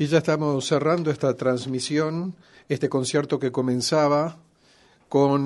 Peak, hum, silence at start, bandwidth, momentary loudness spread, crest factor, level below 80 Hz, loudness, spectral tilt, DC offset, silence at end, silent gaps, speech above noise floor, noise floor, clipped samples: -6 dBFS; none; 0 s; 11.5 kHz; 6 LU; 16 dB; -64 dBFS; -23 LUFS; -5.5 dB/octave; under 0.1%; 0 s; none; 35 dB; -58 dBFS; under 0.1%